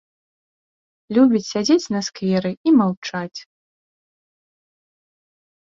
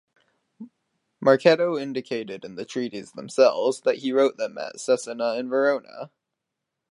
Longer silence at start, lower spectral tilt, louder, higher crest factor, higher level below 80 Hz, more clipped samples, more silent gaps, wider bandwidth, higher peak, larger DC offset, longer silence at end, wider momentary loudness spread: first, 1.1 s vs 0.6 s; about the same, -5.5 dB/octave vs -4.5 dB/octave; first, -19 LUFS vs -23 LUFS; about the same, 18 dB vs 22 dB; first, -64 dBFS vs -78 dBFS; neither; first, 2.57-2.64 s, 2.97-3.02 s vs none; second, 7.6 kHz vs 11 kHz; about the same, -4 dBFS vs -4 dBFS; neither; first, 2.25 s vs 0.85 s; second, 12 LU vs 16 LU